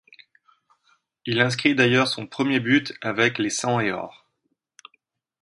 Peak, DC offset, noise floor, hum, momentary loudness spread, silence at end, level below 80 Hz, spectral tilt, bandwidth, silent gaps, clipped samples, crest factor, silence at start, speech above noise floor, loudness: -2 dBFS; under 0.1%; -75 dBFS; none; 9 LU; 1.3 s; -64 dBFS; -4.5 dB/octave; 11.5 kHz; none; under 0.1%; 22 dB; 1.25 s; 53 dB; -22 LUFS